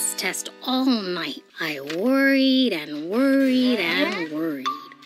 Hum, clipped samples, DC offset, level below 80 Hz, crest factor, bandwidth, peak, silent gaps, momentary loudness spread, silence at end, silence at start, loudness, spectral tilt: none; under 0.1%; under 0.1%; under -90 dBFS; 16 dB; 15.5 kHz; -8 dBFS; none; 10 LU; 0 s; 0 s; -22 LUFS; -3 dB/octave